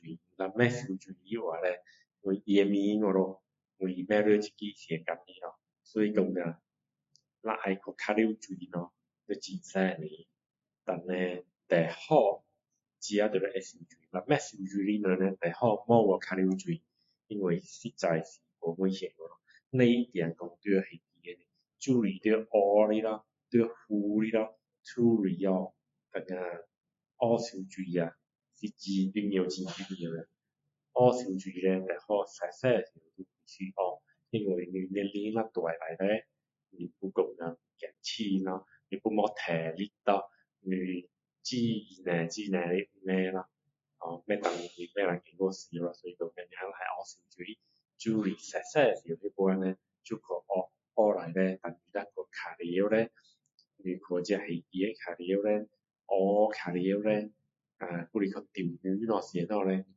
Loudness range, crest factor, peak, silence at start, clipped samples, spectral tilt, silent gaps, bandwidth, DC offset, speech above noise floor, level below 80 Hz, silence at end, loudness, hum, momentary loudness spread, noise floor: 6 LU; 24 dB; -8 dBFS; 0.05 s; under 0.1%; -6.5 dB/octave; 53.54-53.58 s; 8 kHz; under 0.1%; 55 dB; -78 dBFS; 0.15 s; -32 LUFS; none; 15 LU; -86 dBFS